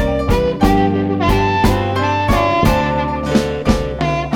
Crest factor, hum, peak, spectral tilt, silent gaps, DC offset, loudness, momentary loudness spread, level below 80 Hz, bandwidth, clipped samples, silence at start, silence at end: 14 dB; none; 0 dBFS; -6.5 dB/octave; none; under 0.1%; -16 LUFS; 4 LU; -24 dBFS; 18 kHz; under 0.1%; 0 s; 0 s